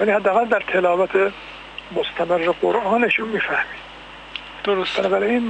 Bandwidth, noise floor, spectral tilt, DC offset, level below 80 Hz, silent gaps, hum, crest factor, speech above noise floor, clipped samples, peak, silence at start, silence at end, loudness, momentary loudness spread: 9 kHz; -39 dBFS; -5.5 dB/octave; under 0.1%; -52 dBFS; none; none; 14 dB; 20 dB; under 0.1%; -6 dBFS; 0 s; 0 s; -20 LUFS; 16 LU